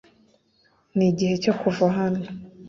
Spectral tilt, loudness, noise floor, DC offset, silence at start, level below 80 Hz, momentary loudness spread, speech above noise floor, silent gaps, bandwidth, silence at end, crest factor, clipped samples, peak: -7 dB/octave; -23 LUFS; -63 dBFS; under 0.1%; 0.95 s; -60 dBFS; 9 LU; 41 dB; none; 7.4 kHz; 0 s; 18 dB; under 0.1%; -6 dBFS